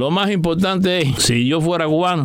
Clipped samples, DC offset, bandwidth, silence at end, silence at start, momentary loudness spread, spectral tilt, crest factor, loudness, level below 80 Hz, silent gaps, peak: under 0.1%; under 0.1%; 16.5 kHz; 0 s; 0 s; 2 LU; -5 dB/octave; 12 dB; -17 LUFS; -42 dBFS; none; -4 dBFS